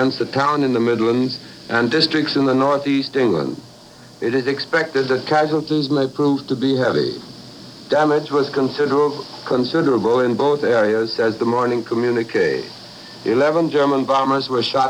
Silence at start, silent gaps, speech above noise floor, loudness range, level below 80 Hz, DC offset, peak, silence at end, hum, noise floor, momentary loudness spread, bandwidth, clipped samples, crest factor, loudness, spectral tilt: 0 s; none; 25 dB; 2 LU; -60 dBFS; under 0.1%; -4 dBFS; 0 s; none; -43 dBFS; 9 LU; 11.5 kHz; under 0.1%; 16 dB; -18 LUFS; -6 dB/octave